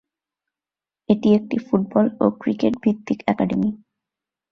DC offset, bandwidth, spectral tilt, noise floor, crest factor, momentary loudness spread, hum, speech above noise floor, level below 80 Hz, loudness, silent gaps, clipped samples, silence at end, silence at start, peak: under 0.1%; 6.6 kHz; -8.5 dB/octave; under -90 dBFS; 18 dB; 6 LU; none; over 70 dB; -58 dBFS; -21 LUFS; none; under 0.1%; 0.75 s; 1.1 s; -2 dBFS